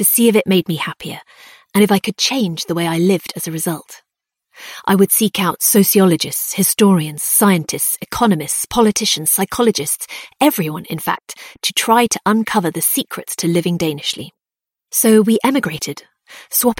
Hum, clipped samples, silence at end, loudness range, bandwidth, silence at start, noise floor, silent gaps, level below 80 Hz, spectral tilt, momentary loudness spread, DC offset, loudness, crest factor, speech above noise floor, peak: none; under 0.1%; 0.05 s; 4 LU; 17 kHz; 0 s; -87 dBFS; none; -52 dBFS; -4 dB/octave; 12 LU; under 0.1%; -15 LUFS; 16 dB; 71 dB; 0 dBFS